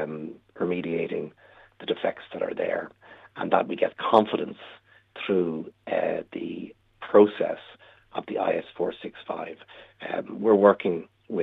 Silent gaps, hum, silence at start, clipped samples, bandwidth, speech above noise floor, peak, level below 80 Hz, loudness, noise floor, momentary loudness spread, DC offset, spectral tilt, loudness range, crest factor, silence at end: none; none; 0 s; under 0.1%; 4.8 kHz; 26 dB; -4 dBFS; -70 dBFS; -26 LUFS; -51 dBFS; 20 LU; under 0.1%; -8 dB/octave; 4 LU; 24 dB; 0 s